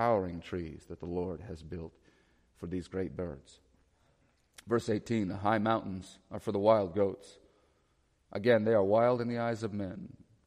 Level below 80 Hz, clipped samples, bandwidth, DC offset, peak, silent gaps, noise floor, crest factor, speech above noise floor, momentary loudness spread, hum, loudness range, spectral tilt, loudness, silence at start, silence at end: -62 dBFS; under 0.1%; 12 kHz; under 0.1%; -12 dBFS; none; -72 dBFS; 22 dB; 40 dB; 18 LU; none; 11 LU; -7 dB/octave; -32 LUFS; 0 s; 0.4 s